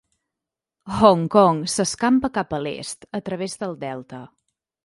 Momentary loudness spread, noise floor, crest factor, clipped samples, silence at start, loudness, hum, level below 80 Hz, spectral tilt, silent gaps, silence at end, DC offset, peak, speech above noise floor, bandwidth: 16 LU; -86 dBFS; 22 dB; under 0.1%; 0.85 s; -21 LUFS; none; -54 dBFS; -5 dB/octave; none; 0.6 s; under 0.1%; 0 dBFS; 66 dB; 11.5 kHz